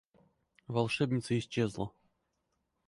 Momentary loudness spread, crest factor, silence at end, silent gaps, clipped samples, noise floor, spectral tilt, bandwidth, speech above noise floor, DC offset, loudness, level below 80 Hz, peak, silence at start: 9 LU; 20 dB; 1 s; none; under 0.1%; -81 dBFS; -6 dB/octave; 11.5 kHz; 48 dB; under 0.1%; -34 LUFS; -64 dBFS; -16 dBFS; 0.7 s